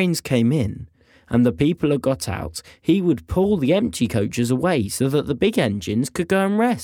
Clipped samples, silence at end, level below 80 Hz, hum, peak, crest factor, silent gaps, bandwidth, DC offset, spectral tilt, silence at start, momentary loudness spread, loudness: under 0.1%; 0 s; -46 dBFS; none; -4 dBFS; 16 dB; none; 18.5 kHz; under 0.1%; -6 dB/octave; 0 s; 6 LU; -21 LUFS